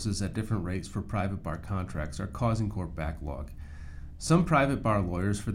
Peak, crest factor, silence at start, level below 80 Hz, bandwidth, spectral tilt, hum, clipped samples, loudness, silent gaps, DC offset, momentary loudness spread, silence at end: -10 dBFS; 20 dB; 0 s; -42 dBFS; 14.5 kHz; -6.5 dB/octave; none; under 0.1%; -30 LUFS; none; under 0.1%; 16 LU; 0 s